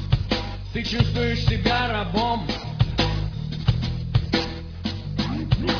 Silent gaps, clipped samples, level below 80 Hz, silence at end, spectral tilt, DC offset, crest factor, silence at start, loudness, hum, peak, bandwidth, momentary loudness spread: none; under 0.1%; -32 dBFS; 0 s; -6.5 dB/octave; under 0.1%; 18 dB; 0 s; -24 LUFS; none; -6 dBFS; 5.4 kHz; 7 LU